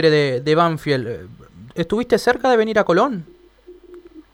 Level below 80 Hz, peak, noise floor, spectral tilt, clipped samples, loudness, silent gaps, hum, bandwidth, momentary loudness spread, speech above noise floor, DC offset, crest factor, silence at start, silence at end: -50 dBFS; -2 dBFS; -46 dBFS; -6 dB/octave; under 0.1%; -18 LUFS; none; none; 15 kHz; 14 LU; 28 dB; under 0.1%; 16 dB; 0 s; 0.15 s